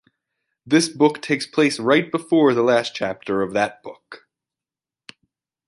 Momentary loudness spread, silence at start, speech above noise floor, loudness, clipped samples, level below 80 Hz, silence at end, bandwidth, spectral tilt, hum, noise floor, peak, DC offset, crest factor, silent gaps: 9 LU; 0.65 s; over 71 dB; -19 LUFS; under 0.1%; -64 dBFS; 1.5 s; 11.5 kHz; -4.5 dB/octave; none; under -90 dBFS; -4 dBFS; under 0.1%; 18 dB; none